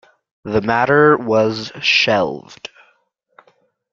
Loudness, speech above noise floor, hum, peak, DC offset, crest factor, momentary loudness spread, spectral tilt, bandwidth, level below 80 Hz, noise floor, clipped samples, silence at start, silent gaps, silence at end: -15 LUFS; 46 dB; none; -2 dBFS; under 0.1%; 16 dB; 23 LU; -5 dB/octave; 7.4 kHz; -54 dBFS; -62 dBFS; under 0.1%; 0.45 s; none; 1.35 s